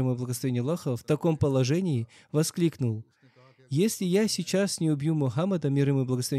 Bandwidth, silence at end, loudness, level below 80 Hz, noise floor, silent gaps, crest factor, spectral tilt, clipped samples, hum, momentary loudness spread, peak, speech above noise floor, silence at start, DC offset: 15 kHz; 0 s; -27 LUFS; -64 dBFS; -58 dBFS; none; 14 dB; -6 dB/octave; under 0.1%; none; 6 LU; -12 dBFS; 31 dB; 0 s; under 0.1%